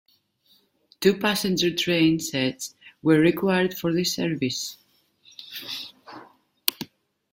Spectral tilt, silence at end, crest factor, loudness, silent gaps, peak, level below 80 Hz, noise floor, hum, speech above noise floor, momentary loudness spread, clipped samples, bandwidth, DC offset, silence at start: -4.5 dB/octave; 0.45 s; 26 dB; -24 LUFS; none; 0 dBFS; -62 dBFS; -63 dBFS; none; 41 dB; 19 LU; under 0.1%; 16.5 kHz; under 0.1%; 1 s